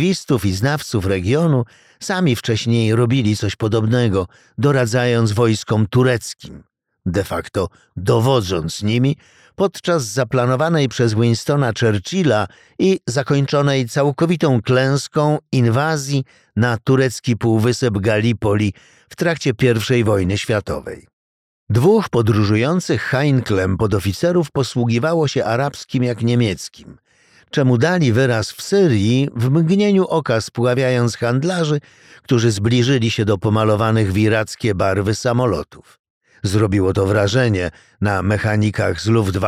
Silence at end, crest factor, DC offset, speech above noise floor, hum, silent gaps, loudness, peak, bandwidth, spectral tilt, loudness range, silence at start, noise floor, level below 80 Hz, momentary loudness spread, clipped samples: 0 s; 14 dB; under 0.1%; over 73 dB; none; 21.13-21.67 s, 35.99-36.04 s, 36.10-36.21 s; -17 LUFS; -2 dBFS; 15 kHz; -6 dB/octave; 2 LU; 0 s; under -90 dBFS; -46 dBFS; 7 LU; under 0.1%